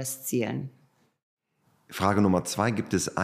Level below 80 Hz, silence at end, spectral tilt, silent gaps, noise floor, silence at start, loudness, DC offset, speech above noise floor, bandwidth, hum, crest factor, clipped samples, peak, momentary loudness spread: -62 dBFS; 0 s; -5 dB/octave; 1.23-1.37 s; -69 dBFS; 0 s; -27 LUFS; under 0.1%; 42 dB; 15.5 kHz; none; 20 dB; under 0.1%; -8 dBFS; 13 LU